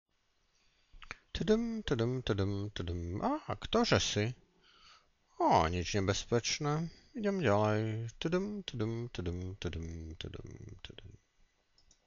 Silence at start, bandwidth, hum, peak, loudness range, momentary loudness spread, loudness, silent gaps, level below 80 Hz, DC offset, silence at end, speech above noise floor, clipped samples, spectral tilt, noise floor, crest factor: 0.95 s; 7.6 kHz; none; -14 dBFS; 7 LU; 18 LU; -34 LUFS; none; -52 dBFS; under 0.1%; 0.95 s; 41 dB; under 0.1%; -5 dB/octave; -75 dBFS; 20 dB